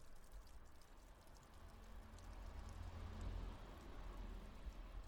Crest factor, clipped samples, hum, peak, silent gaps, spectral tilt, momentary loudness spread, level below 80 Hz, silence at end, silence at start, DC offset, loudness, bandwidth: 14 dB; under 0.1%; none; -40 dBFS; none; -5.5 dB/octave; 12 LU; -56 dBFS; 0 s; 0 s; under 0.1%; -58 LUFS; 18.5 kHz